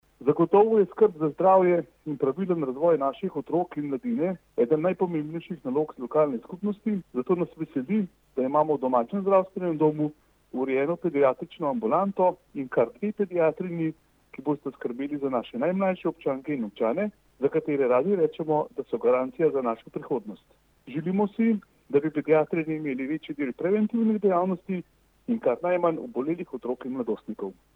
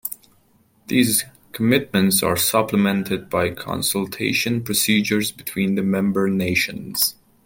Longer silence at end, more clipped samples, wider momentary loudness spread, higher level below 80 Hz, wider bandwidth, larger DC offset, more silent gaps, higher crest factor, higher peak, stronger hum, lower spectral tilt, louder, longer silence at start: about the same, 0.25 s vs 0.35 s; neither; first, 9 LU vs 6 LU; second, -68 dBFS vs -56 dBFS; second, 4.1 kHz vs 17 kHz; neither; neither; about the same, 18 dB vs 18 dB; second, -8 dBFS vs -2 dBFS; neither; first, -9.5 dB/octave vs -4 dB/octave; second, -26 LUFS vs -20 LUFS; first, 0.2 s vs 0.05 s